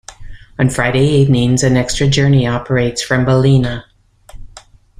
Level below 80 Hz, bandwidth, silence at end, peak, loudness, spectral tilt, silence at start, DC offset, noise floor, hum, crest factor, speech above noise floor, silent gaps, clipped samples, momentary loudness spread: -34 dBFS; 11.5 kHz; 0.4 s; 0 dBFS; -13 LUFS; -5.5 dB/octave; 0.1 s; under 0.1%; -41 dBFS; none; 14 dB; 29 dB; none; under 0.1%; 6 LU